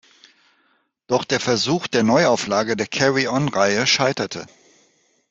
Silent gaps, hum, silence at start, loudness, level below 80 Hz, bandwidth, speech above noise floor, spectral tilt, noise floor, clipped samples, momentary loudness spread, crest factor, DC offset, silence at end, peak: none; none; 1.1 s; -19 LUFS; -60 dBFS; 8.4 kHz; 45 dB; -4 dB/octave; -64 dBFS; under 0.1%; 7 LU; 20 dB; under 0.1%; 0.85 s; -2 dBFS